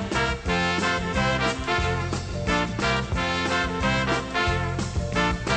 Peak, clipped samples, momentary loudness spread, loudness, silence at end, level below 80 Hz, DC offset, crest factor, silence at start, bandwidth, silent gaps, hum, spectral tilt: -10 dBFS; under 0.1%; 4 LU; -24 LUFS; 0 s; -36 dBFS; under 0.1%; 16 dB; 0 s; 9.8 kHz; none; none; -4.5 dB/octave